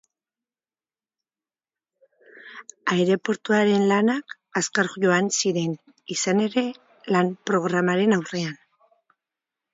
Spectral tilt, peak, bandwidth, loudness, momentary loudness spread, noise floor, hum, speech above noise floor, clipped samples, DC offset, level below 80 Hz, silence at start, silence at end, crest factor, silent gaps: -4.5 dB/octave; -6 dBFS; 7.8 kHz; -23 LUFS; 11 LU; under -90 dBFS; none; over 68 dB; under 0.1%; under 0.1%; -72 dBFS; 2.45 s; 1.2 s; 18 dB; none